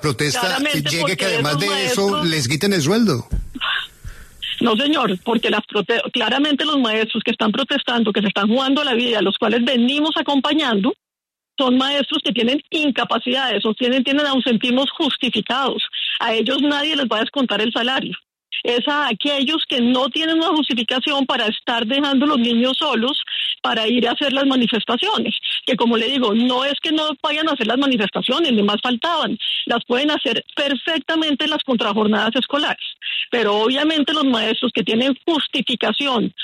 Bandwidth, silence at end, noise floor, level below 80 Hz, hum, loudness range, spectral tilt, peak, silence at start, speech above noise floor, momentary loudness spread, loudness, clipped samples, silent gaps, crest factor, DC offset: 13.5 kHz; 0 s; -87 dBFS; -46 dBFS; none; 2 LU; -4 dB/octave; -6 dBFS; 0 s; 68 dB; 4 LU; -18 LUFS; under 0.1%; none; 14 dB; under 0.1%